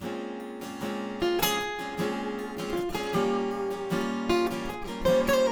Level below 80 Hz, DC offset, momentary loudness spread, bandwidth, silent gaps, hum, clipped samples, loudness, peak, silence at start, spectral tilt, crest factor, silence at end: -48 dBFS; under 0.1%; 10 LU; over 20 kHz; none; none; under 0.1%; -29 LUFS; -10 dBFS; 0 s; -4.5 dB/octave; 20 dB; 0 s